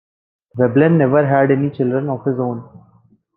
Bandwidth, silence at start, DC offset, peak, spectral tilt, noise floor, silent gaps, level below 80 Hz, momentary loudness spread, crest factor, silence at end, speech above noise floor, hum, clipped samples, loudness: 4.1 kHz; 0.55 s; under 0.1%; -2 dBFS; -12 dB/octave; -54 dBFS; none; -60 dBFS; 11 LU; 16 dB; 0.6 s; 38 dB; none; under 0.1%; -16 LUFS